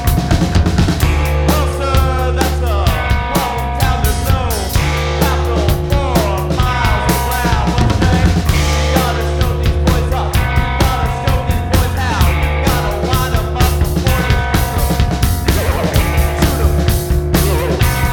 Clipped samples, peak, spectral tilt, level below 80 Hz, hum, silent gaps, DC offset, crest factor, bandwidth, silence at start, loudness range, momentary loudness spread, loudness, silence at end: under 0.1%; 0 dBFS; -5.5 dB/octave; -18 dBFS; none; none; under 0.1%; 12 dB; over 20 kHz; 0 s; 1 LU; 2 LU; -15 LUFS; 0 s